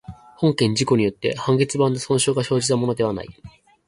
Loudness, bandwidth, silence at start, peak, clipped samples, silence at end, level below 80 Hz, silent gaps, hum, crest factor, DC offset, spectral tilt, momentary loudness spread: -20 LUFS; 11.5 kHz; 0.1 s; -4 dBFS; under 0.1%; 0.4 s; -52 dBFS; none; none; 16 dB; under 0.1%; -5 dB/octave; 6 LU